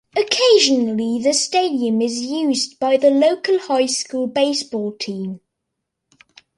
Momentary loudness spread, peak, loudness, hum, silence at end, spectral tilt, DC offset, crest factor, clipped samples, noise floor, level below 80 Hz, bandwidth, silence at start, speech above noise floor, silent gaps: 12 LU; -2 dBFS; -18 LUFS; none; 1.2 s; -3 dB/octave; under 0.1%; 18 dB; under 0.1%; -78 dBFS; -66 dBFS; 11.5 kHz; 0.15 s; 61 dB; none